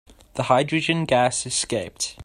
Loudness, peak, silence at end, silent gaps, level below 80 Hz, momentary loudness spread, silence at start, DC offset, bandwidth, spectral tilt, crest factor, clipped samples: -22 LUFS; -2 dBFS; 0 s; none; -54 dBFS; 9 LU; 0.35 s; under 0.1%; 13.5 kHz; -3.5 dB/octave; 20 dB; under 0.1%